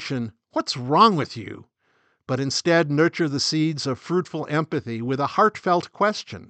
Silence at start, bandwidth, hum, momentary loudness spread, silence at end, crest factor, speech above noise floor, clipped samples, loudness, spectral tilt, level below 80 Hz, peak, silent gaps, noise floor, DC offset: 0 s; 9 kHz; none; 12 LU; 0.05 s; 20 dB; 44 dB; under 0.1%; -22 LUFS; -5 dB/octave; -66 dBFS; -4 dBFS; none; -66 dBFS; under 0.1%